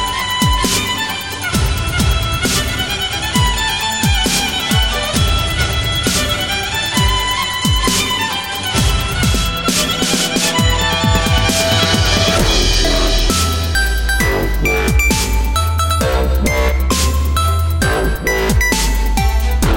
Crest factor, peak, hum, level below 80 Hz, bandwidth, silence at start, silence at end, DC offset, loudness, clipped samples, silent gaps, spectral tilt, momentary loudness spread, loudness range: 14 dB; 0 dBFS; none; -20 dBFS; 17.5 kHz; 0 s; 0 s; under 0.1%; -15 LUFS; under 0.1%; none; -3.5 dB/octave; 4 LU; 2 LU